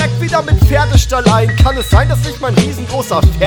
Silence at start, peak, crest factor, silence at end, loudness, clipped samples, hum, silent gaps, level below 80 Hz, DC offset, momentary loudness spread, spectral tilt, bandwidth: 0 s; 0 dBFS; 10 dB; 0 s; -12 LUFS; 0.4%; none; none; -16 dBFS; under 0.1%; 6 LU; -5.5 dB/octave; 19.5 kHz